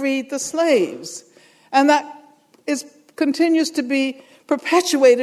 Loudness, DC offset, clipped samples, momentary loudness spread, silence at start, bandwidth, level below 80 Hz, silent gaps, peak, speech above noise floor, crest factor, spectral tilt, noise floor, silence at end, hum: -19 LUFS; under 0.1%; under 0.1%; 18 LU; 0 s; 14 kHz; -76 dBFS; none; -2 dBFS; 32 dB; 18 dB; -2.5 dB/octave; -49 dBFS; 0 s; none